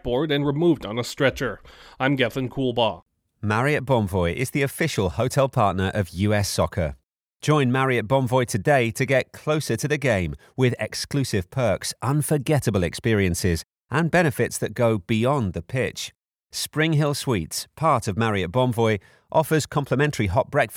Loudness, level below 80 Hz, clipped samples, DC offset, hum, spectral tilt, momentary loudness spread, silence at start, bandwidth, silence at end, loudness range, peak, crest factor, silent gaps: -23 LUFS; -46 dBFS; under 0.1%; under 0.1%; none; -5.5 dB/octave; 7 LU; 0.05 s; 19.5 kHz; 0 s; 2 LU; -6 dBFS; 16 dB; 3.02-3.06 s